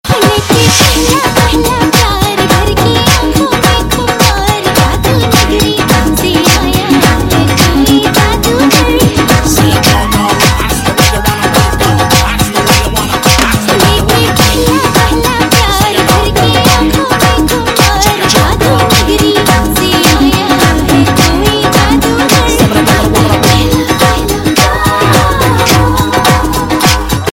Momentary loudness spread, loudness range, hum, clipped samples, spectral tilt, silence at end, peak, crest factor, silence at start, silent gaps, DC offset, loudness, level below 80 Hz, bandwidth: 3 LU; 1 LU; none; 0.8%; -4 dB/octave; 0 s; 0 dBFS; 8 dB; 0.05 s; none; under 0.1%; -8 LUFS; -18 dBFS; 17.5 kHz